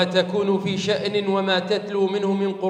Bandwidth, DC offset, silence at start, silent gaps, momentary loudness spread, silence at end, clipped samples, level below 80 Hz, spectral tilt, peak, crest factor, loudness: 9.8 kHz; under 0.1%; 0 s; none; 2 LU; 0 s; under 0.1%; -70 dBFS; -5.5 dB/octave; -6 dBFS; 16 dB; -22 LUFS